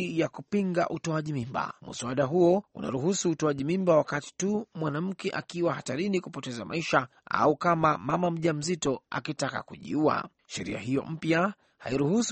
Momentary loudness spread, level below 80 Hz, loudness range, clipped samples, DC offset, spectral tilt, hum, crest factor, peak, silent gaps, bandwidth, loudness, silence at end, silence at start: 10 LU; -62 dBFS; 3 LU; under 0.1%; under 0.1%; -5.5 dB/octave; none; 20 dB; -8 dBFS; none; 8.4 kHz; -29 LUFS; 0 s; 0 s